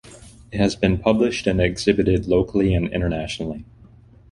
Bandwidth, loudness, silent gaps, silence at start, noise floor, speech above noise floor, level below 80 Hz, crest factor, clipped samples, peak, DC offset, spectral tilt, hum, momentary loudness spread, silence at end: 11.5 kHz; -21 LUFS; none; 0.05 s; -48 dBFS; 28 dB; -36 dBFS; 20 dB; under 0.1%; -2 dBFS; under 0.1%; -6.5 dB/octave; none; 10 LU; 0.7 s